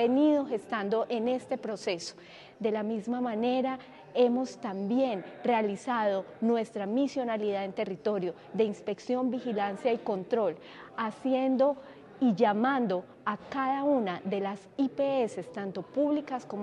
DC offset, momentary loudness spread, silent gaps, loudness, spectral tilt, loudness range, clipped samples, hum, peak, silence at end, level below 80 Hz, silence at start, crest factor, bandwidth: under 0.1%; 9 LU; none; -30 LUFS; -6 dB/octave; 3 LU; under 0.1%; none; -12 dBFS; 0 s; -78 dBFS; 0 s; 18 dB; 10.5 kHz